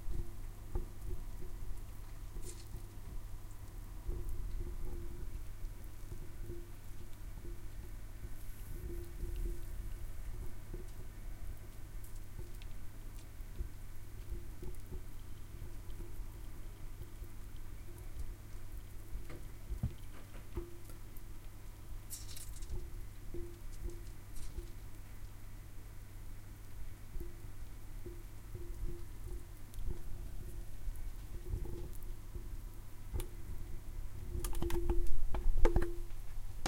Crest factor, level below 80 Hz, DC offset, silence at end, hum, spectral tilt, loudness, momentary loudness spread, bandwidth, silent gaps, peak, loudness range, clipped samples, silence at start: 24 dB; -42 dBFS; under 0.1%; 0 s; none; -5.5 dB/octave; -48 LUFS; 9 LU; 16.5 kHz; none; -12 dBFS; 6 LU; under 0.1%; 0 s